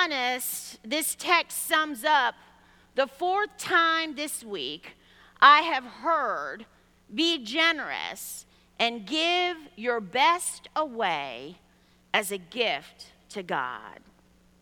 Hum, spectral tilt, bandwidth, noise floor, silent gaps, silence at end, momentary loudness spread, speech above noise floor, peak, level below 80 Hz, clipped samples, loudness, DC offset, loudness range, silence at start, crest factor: none; -1 dB/octave; 19 kHz; -61 dBFS; none; 0.7 s; 14 LU; 34 dB; -4 dBFS; -68 dBFS; under 0.1%; -26 LUFS; under 0.1%; 7 LU; 0 s; 24 dB